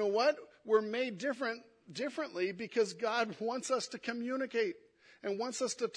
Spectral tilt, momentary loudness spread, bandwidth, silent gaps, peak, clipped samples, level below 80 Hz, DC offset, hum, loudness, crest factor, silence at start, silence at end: -3.5 dB/octave; 9 LU; 10.5 kHz; none; -16 dBFS; under 0.1%; -86 dBFS; under 0.1%; none; -35 LUFS; 18 dB; 0 s; 0 s